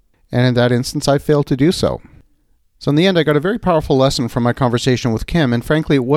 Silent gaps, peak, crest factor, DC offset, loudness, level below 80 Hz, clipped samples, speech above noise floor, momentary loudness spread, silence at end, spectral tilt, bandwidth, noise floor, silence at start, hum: none; 0 dBFS; 14 dB; under 0.1%; -16 LUFS; -36 dBFS; under 0.1%; 42 dB; 4 LU; 0 s; -6 dB/octave; 15.5 kHz; -57 dBFS; 0.3 s; none